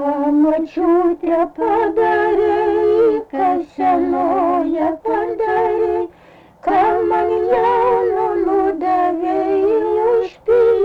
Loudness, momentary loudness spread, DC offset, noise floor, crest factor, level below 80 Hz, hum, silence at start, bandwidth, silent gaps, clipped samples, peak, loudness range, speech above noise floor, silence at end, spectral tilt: -16 LUFS; 4 LU; under 0.1%; -45 dBFS; 10 dB; -48 dBFS; none; 0 s; 6 kHz; none; under 0.1%; -6 dBFS; 2 LU; 30 dB; 0 s; -7.5 dB/octave